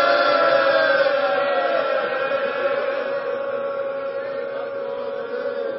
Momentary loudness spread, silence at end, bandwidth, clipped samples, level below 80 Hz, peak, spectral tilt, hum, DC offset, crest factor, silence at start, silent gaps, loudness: 11 LU; 0 s; 5.8 kHz; under 0.1%; -74 dBFS; -6 dBFS; 0 dB/octave; none; under 0.1%; 16 dB; 0 s; none; -21 LUFS